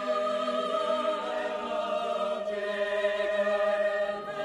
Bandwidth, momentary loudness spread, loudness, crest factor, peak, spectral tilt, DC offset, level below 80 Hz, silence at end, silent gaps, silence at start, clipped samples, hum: 11 kHz; 5 LU; -29 LUFS; 12 dB; -16 dBFS; -3.5 dB/octave; under 0.1%; -68 dBFS; 0 s; none; 0 s; under 0.1%; none